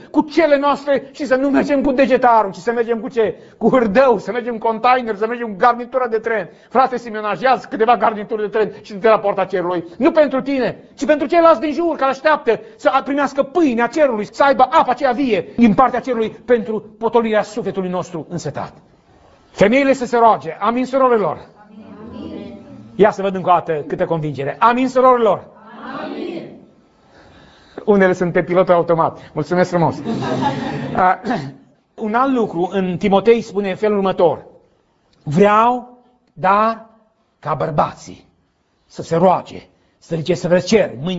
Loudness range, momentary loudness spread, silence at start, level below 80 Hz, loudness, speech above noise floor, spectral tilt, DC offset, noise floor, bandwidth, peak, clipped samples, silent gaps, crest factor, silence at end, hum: 4 LU; 13 LU; 0.05 s; -52 dBFS; -16 LUFS; 46 dB; -6.5 dB/octave; under 0.1%; -62 dBFS; 8 kHz; 0 dBFS; under 0.1%; none; 16 dB; 0 s; none